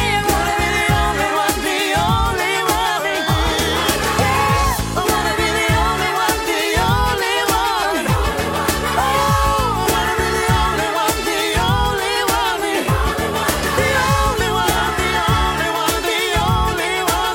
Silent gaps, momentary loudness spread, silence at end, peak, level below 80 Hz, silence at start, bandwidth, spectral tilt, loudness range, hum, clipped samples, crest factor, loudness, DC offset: none; 2 LU; 0 s; -4 dBFS; -28 dBFS; 0 s; 17 kHz; -3.5 dB/octave; 1 LU; none; under 0.1%; 12 dB; -17 LUFS; under 0.1%